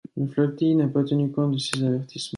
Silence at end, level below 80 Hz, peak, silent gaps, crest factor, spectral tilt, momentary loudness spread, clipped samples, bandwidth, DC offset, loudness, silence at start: 0 s; -66 dBFS; -6 dBFS; none; 18 dB; -6.5 dB/octave; 5 LU; under 0.1%; 11.5 kHz; under 0.1%; -24 LUFS; 0.15 s